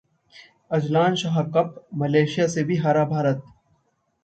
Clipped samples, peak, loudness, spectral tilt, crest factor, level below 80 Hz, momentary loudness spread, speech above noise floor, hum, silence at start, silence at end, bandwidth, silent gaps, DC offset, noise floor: under 0.1%; -6 dBFS; -22 LUFS; -6.5 dB/octave; 18 dB; -64 dBFS; 7 LU; 47 dB; none; 0.35 s; 0.85 s; 8.8 kHz; none; under 0.1%; -69 dBFS